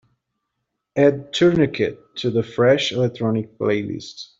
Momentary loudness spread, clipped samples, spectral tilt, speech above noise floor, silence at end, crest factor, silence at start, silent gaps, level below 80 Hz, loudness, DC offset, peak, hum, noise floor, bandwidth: 9 LU; under 0.1%; -6 dB/octave; 58 dB; 0.15 s; 18 dB; 0.95 s; none; -56 dBFS; -20 LUFS; under 0.1%; -4 dBFS; none; -78 dBFS; 7.8 kHz